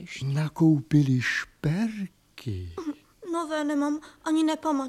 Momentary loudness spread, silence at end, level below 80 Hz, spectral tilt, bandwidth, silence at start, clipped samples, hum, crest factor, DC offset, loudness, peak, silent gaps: 15 LU; 0 s; -56 dBFS; -6.5 dB/octave; 13.5 kHz; 0 s; under 0.1%; none; 16 dB; under 0.1%; -27 LUFS; -10 dBFS; none